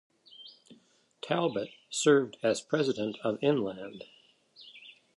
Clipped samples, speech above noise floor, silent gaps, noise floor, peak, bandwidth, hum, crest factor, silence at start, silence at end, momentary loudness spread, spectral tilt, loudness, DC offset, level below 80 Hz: under 0.1%; 35 dB; none; -64 dBFS; -12 dBFS; 11.5 kHz; none; 20 dB; 0.4 s; 0.25 s; 25 LU; -4.5 dB/octave; -30 LUFS; under 0.1%; -76 dBFS